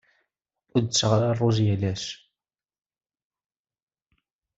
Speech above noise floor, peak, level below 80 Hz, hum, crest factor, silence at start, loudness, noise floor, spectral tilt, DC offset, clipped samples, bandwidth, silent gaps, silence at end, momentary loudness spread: over 67 dB; -6 dBFS; -62 dBFS; none; 20 dB; 0.75 s; -24 LUFS; under -90 dBFS; -5.5 dB/octave; under 0.1%; under 0.1%; 8 kHz; none; 2.4 s; 12 LU